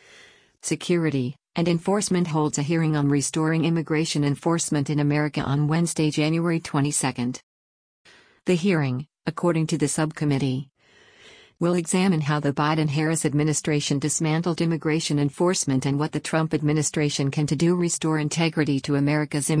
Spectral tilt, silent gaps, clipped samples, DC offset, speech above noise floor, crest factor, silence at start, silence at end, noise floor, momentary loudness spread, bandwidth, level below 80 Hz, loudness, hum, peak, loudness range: -5 dB/octave; 7.43-8.05 s; under 0.1%; under 0.1%; 32 dB; 14 dB; 0.65 s; 0 s; -55 dBFS; 4 LU; 10.5 kHz; -58 dBFS; -23 LUFS; none; -8 dBFS; 3 LU